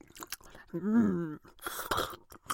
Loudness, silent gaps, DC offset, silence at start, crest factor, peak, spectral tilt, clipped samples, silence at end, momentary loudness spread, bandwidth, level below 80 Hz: -34 LUFS; none; under 0.1%; 0.15 s; 18 dB; -16 dBFS; -5 dB/octave; under 0.1%; 0 s; 15 LU; 17 kHz; -58 dBFS